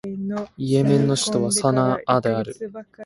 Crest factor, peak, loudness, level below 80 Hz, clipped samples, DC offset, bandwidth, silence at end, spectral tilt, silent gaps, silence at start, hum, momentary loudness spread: 18 dB; -2 dBFS; -21 LUFS; -56 dBFS; under 0.1%; under 0.1%; 11.5 kHz; 0 s; -5.5 dB/octave; none; 0.05 s; none; 11 LU